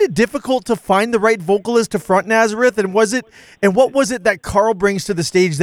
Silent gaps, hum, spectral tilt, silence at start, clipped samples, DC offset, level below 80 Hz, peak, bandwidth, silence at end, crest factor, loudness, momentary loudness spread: none; none; -4.5 dB/octave; 0 s; under 0.1%; under 0.1%; -46 dBFS; -2 dBFS; 16 kHz; 0 s; 14 dB; -16 LUFS; 5 LU